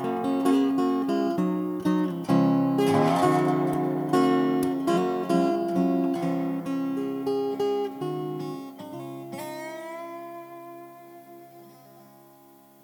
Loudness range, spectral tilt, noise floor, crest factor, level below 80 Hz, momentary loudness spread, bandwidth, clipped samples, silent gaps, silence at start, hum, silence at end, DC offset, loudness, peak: 16 LU; -7 dB/octave; -54 dBFS; 18 dB; -70 dBFS; 16 LU; 19.5 kHz; under 0.1%; none; 0 s; none; 0.85 s; under 0.1%; -25 LUFS; -8 dBFS